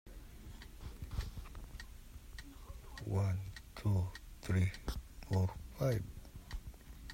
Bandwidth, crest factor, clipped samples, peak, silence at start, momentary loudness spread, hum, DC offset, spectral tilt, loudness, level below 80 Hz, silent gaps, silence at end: 16 kHz; 18 dB; under 0.1%; -22 dBFS; 0.05 s; 18 LU; none; under 0.1%; -7 dB/octave; -40 LUFS; -50 dBFS; none; 0 s